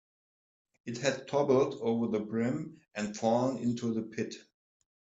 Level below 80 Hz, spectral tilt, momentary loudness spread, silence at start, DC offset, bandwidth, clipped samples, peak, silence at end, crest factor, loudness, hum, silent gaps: -72 dBFS; -6 dB/octave; 13 LU; 0.85 s; under 0.1%; 8 kHz; under 0.1%; -14 dBFS; 0.65 s; 18 dB; -32 LUFS; none; none